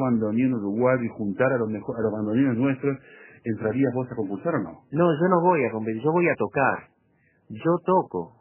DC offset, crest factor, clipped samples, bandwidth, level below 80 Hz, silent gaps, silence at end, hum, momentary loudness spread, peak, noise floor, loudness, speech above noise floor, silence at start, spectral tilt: under 0.1%; 18 dB; under 0.1%; 3.2 kHz; -62 dBFS; none; 0.1 s; none; 9 LU; -6 dBFS; -64 dBFS; -24 LUFS; 41 dB; 0 s; -12 dB/octave